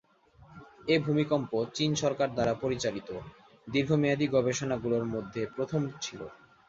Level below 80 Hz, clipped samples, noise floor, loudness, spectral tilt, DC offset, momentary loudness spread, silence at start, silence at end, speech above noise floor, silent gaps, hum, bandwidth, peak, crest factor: -60 dBFS; under 0.1%; -59 dBFS; -30 LUFS; -5.5 dB/octave; under 0.1%; 13 LU; 0.5 s; 0.35 s; 29 dB; none; none; 8 kHz; -12 dBFS; 18 dB